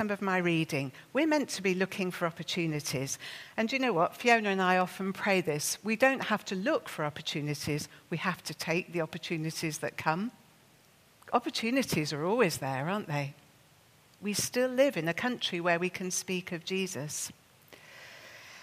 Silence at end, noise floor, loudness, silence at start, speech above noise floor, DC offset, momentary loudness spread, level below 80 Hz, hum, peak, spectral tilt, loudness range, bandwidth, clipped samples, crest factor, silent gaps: 0 s; -62 dBFS; -31 LUFS; 0 s; 31 dB; under 0.1%; 9 LU; -72 dBFS; none; -10 dBFS; -4 dB/octave; 6 LU; 15.5 kHz; under 0.1%; 22 dB; none